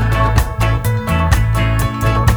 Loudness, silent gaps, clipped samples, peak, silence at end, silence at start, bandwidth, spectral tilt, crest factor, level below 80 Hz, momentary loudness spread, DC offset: -15 LUFS; none; under 0.1%; 0 dBFS; 0 s; 0 s; over 20 kHz; -6 dB/octave; 14 dB; -18 dBFS; 2 LU; under 0.1%